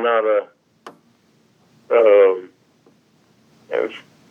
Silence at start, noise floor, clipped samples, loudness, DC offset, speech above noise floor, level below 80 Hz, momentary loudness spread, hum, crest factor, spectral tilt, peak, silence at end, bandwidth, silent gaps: 0 s; -58 dBFS; under 0.1%; -17 LUFS; under 0.1%; 42 dB; -86 dBFS; 15 LU; none; 16 dB; -5 dB/octave; -4 dBFS; 0.3 s; 3.7 kHz; none